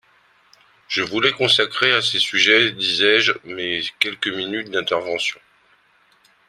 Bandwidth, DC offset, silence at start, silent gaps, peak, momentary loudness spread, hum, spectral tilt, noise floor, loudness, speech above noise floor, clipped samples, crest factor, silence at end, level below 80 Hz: 14.5 kHz; under 0.1%; 0.9 s; none; 0 dBFS; 10 LU; none; -2.5 dB/octave; -58 dBFS; -18 LUFS; 38 dB; under 0.1%; 20 dB; 1.15 s; -64 dBFS